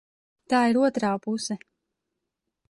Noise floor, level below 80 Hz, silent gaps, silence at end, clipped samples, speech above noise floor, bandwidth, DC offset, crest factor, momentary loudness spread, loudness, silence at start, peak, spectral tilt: -83 dBFS; -70 dBFS; none; 1.15 s; under 0.1%; 59 dB; 11.5 kHz; under 0.1%; 16 dB; 11 LU; -25 LUFS; 0.5 s; -12 dBFS; -4.5 dB/octave